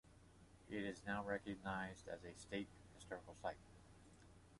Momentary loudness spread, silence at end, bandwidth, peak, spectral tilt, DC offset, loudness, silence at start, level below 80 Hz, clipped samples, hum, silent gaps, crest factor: 20 LU; 0 s; 11.5 kHz; -30 dBFS; -5 dB/octave; under 0.1%; -49 LUFS; 0.05 s; -70 dBFS; under 0.1%; none; none; 20 dB